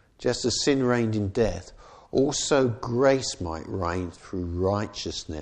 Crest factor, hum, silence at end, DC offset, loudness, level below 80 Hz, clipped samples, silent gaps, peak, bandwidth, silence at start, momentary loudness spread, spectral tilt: 16 dB; none; 0 s; under 0.1%; -26 LUFS; -46 dBFS; under 0.1%; none; -8 dBFS; 10 kHz; 0.2 s; 10 LU; -4.5 dB/octave